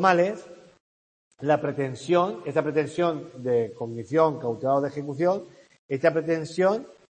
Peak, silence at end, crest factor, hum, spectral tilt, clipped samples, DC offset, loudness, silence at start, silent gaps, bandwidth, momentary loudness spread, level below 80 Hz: -4 dBFS; 0.25 s; 20 dB; none; -6.5 dB/octave; under 0.1%; under 0.1%; -26 LUFS; 0 s; 0.80-1.31 s, 5.79-5.89 s; 8.8 kHz; 9 LU; -70 dBFS